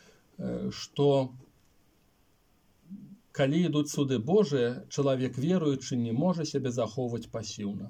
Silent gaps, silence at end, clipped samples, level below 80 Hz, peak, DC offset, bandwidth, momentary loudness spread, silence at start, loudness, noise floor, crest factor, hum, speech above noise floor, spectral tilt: none; 0 s; under 0.1%; -66 dBFS; -14 dBFS; under 0.1%; 15.5 kHz; 12 LU; 0.4 s; -29 LUFS; -67 dBFS; 16 dB; none; 38 dB; -6.5 dB/octave